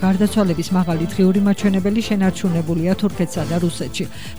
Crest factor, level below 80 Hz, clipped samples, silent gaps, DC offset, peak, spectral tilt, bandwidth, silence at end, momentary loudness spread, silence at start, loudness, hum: 12 dB; -42 dBFS; under 0.1%; none; 2%; -6 dBFS; -6.5 dB/octave; over 20 kHz; 0 s; 6 LU; 0 s; -19 LUFS; none